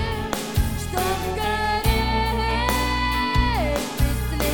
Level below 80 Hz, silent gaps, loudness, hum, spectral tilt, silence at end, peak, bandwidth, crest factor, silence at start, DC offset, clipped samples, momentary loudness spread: -26 dBFS; none; -23 LUFS; none; -4.5 dB/octave; 0 s; -6 dBFS; 19 kHz; 16 dB; 0 s; 0.4%; under 0.1%; 4 LU